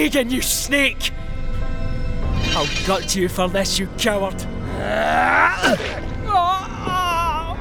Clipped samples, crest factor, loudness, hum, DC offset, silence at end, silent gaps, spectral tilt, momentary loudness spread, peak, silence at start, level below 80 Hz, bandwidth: under 0.1%; 18 dB; -20 LUFS; none; under 0.1%; 0 s; none; -3.5 dB/octave; 12 LU; -2 dBFS; 0 s; -28 dBFS; over 20 kHz